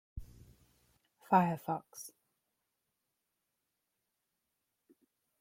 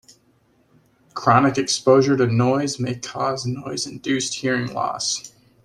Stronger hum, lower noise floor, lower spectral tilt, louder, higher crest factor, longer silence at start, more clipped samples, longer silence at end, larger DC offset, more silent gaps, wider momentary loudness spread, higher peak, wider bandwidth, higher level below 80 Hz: neither; first, -86 dBFS vs -60 dBFS; first, -6.5 dB/octave vs -4.5 dB/octave; second, -33 LUFS vs -20 LUFS; first, 28 dB vs 20 dB; second, 0.15 s vs 1.15 s; neither; first, 3.3 s vs 0.35 s; neither; neither; first, 23 LU vs 11 LU; second, -14 dBFS vs -2 dBFS; first, 16.5 kHz vs 13 kHz; about the same, -62 dBFS vs -58 dBFS